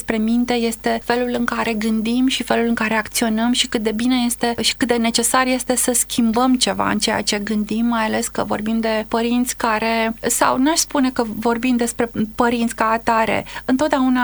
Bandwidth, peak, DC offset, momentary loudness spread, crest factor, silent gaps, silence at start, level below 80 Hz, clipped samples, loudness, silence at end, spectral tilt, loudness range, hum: over 20 kHz; -2 dBFS; under 0.1%; 4 LU; 18 dB; none; 0 s; -44 dBFS; under 0.1%; -18 LUFS; 0 s; -3 dB/octave; 2 LU; none